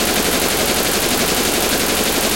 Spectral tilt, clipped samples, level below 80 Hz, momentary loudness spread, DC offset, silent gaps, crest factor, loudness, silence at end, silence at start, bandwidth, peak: -2 dB/octave; under 0.1%; -36 dBFS; 0 LU; under 0.1%; none; 14 dB; -15 LUFS; 0 s; 0 s; 17.5 kHz; -2 dBFS